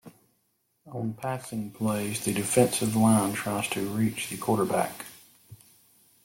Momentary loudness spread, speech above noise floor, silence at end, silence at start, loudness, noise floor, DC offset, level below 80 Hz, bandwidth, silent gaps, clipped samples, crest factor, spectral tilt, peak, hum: 12 LU; 46 dB; 0.7 s; 0.05 s; -27 LUFS; -73 dBFS; under 0.1%; -62 dBFS; 17 kHz; none; under 0.1%; 22 dB; -5 dB/octave; -8 dBFS; none